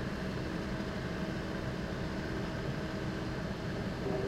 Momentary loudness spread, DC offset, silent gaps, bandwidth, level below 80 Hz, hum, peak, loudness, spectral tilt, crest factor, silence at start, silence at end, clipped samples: 1 LU; under 0.1%; none; 15.5 kHz; -48 dBFS; none; -22 dBFS; -38 LUFS; -6.5 dB/octave; 14 dB; 0 s; 0 s; under 0.1%